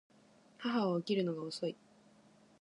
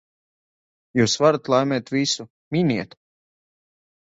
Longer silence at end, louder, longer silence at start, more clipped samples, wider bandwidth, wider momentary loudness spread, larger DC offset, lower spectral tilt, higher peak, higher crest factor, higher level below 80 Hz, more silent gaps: second, 0.85 s vs 1.2 s; second, -37 LUFS vs -21 LUFS; second, 0.6 s vs 0.95 s; neither; first, 11 kHz vs 8 kHz; about the same, 9 LU vs 10 LU; neither; first, -6.5 dB/octave vs -4.5 dB/octave; second, -22 dBFS vs -4 dBFS; about the same, 18 dB vs 20 dB; second, -86 dBFS vs -60 dBFS; second, none vs 2.30-2.51 s